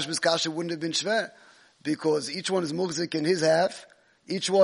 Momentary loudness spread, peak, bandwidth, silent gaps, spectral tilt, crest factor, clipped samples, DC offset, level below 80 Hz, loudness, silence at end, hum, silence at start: 10 LU; -8 dBFS; 10.5 kHz; none; -3.5 dB/octave; 18 dB; under 0.1%; under 0.1%; -74 dBFS; -27 LUFS; 0 s; none; 0 s